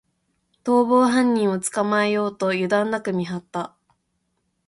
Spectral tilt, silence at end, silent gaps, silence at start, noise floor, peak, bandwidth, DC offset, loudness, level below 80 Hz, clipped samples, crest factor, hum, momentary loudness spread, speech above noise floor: -5 dB/octave; 1 s; none; 0.65 s; -72 dBFS; -6 dBFS; 11.5 kHz; under 0.1%; -21 LUFS; -66 dBFS; under 0.1%; 16 dB; none; 14 LU; 52 dB